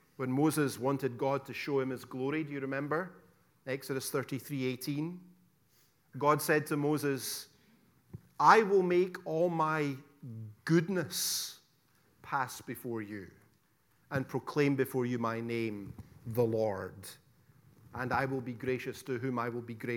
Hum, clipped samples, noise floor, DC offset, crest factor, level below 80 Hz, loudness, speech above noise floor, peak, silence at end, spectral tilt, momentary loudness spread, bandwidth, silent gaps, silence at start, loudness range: none; under 0.1%; -71 dBFS; under 0.1%; 26 dB; -72 dBFS; -33 LUFS; 39 dB; -8 dBFS; 0 s; -5 dB/octave; 16 LU; 18 kHz; none; 0.2 s; 8 LU